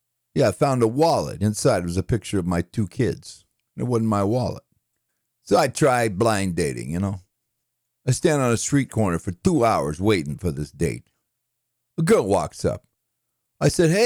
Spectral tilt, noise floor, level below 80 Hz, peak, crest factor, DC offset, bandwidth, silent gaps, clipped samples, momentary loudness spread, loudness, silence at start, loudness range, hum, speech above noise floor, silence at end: -6 dB/octave; -77 dBFS; -48 dBFS; -6 dBFS; 16 dB; under 0.1%; over 20 kHz; none; under 0.1%; 10 LU; -22 LUFS; 0.35 s; 3 LU; none; 56 dB; 0 s